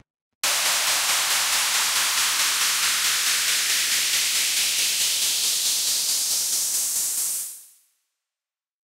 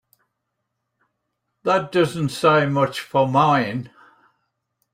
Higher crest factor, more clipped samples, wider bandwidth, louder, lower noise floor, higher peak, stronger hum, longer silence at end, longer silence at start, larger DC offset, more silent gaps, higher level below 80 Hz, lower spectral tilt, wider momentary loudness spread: about the same, 14 dB vs 18 dB; neither; about the same, 16 kHz vs 16 kHz; about the same, -20 LUFS vs -19 LUFS; first, under -90 dBFS vs -78 dBFS; second, -10 dBFS vs -4 dBFS; neither; first, 1.25 s vs 1.05 s; second, 0.45 s vs 1.65 s; neither; neither; about the same, -64 dBFS vs -62 dBFS; second, 3.5 dB/octave vs -6 dB/octave; second, 3 LU vs 11 LU